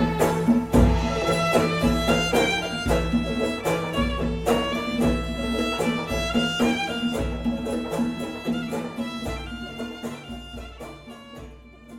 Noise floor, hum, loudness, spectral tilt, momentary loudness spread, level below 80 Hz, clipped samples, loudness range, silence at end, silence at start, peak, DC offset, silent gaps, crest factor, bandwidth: -44 dBFS; none; -24 LUFS; -5.5 dB/octave; 16 LU; -34 dBFS; under 0.1%; 10 LU; 0 s; 0 s; -6 dBFS; under 0.1%; none; 18 dB; 16.5 kHz